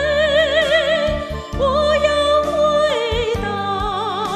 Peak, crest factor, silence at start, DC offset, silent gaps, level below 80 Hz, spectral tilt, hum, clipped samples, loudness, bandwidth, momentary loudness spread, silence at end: -4 dBFS; 14 dB; 0 s; under 0.1%; none; -34 dBFS; -4.5 dB/octave; none; under 0.1%; -17 LUFS; 13 kHz; 6 LU; 0 s